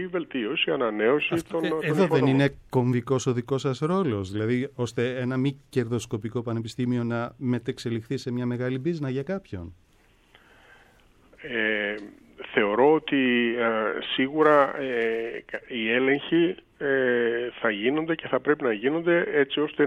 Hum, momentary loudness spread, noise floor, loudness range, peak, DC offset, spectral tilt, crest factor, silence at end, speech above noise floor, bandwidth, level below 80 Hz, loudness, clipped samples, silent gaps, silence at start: none; 10 LU; -60 dBFS; 9 LU; -6 dBFS; under 0.1%; -6.5 dB/octave; 18 dB; 0 s; 35 dB; 13.5 kHz; -60 dBFS; -25 LUFS; under 0.1%; none; 0 s